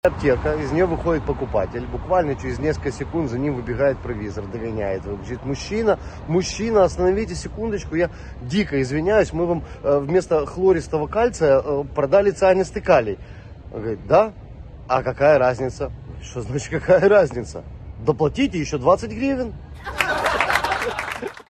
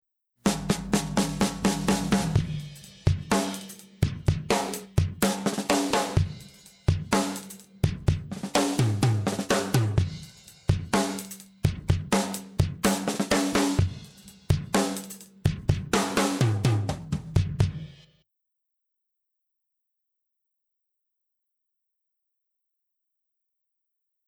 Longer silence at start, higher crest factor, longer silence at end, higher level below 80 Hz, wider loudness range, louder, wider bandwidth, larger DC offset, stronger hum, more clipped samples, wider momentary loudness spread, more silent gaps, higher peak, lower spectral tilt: second, 0.05 s vs 0.45 s; about the same, 18 dB vs 20 dB; second, 0.05 s vs 6.3 s; about the same, -38 dBFS vs -42 dBFS; first, 5 LU vs 2 LU; first, -21 LUFS vs -27 LUFS; second, 13 kHz vs 17 kHz; neither; neither; neither; first, 13 LU vs 10 LU; neither; first, -2 dBFS vs -8 dBFS; about the same, -6 dB/octave vs -5 dB/octave